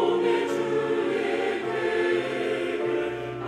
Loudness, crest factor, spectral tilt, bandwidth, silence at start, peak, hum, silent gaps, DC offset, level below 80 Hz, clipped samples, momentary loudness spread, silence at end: -26 LUFS; 14 dB; -5.5 dB/octave; 10.5 kHz; 0 s; -12 dBFS; none; none; under 0.1%; -62 dBFS; under 0.1%; 3 LU; 0 s